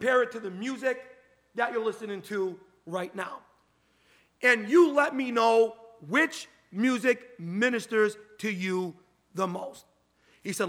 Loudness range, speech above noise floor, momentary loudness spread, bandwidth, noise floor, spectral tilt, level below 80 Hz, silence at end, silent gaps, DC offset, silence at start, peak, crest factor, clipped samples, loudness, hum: 8 LU; 40 dB; 16 LU; 16 kHz; -67 dBFS; -4.5 dB/octave; -80 dBFS; 0 s; none; under 0.1%; 0 s; -8 dBFS; 20 dB; under 0.1%; -28 LUFS; none